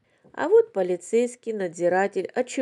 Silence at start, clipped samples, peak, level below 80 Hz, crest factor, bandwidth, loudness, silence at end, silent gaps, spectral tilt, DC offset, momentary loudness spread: 0.35 s; under 0.1%; -8 dBFS; -84 dBFS; 16 dB; 11 kHz; -24 LUFS; 0 s; none; -5 dB/octave; under 0.1%; 10 LU